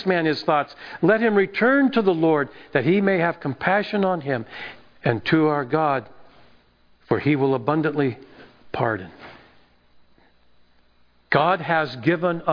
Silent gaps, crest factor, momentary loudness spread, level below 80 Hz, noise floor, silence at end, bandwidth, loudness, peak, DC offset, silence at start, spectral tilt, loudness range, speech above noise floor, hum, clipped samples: none; 20 dB; 9 LU; -60 dBFS; -57 dBFS; 0 s; 5.2 kHz; -21 LUFS; -2 dBFS; under 0.1%; 0 s; -8.5 dB/octave; 8 LU; 36 dB; 60 Hz at -55 dBFS; under 0.1%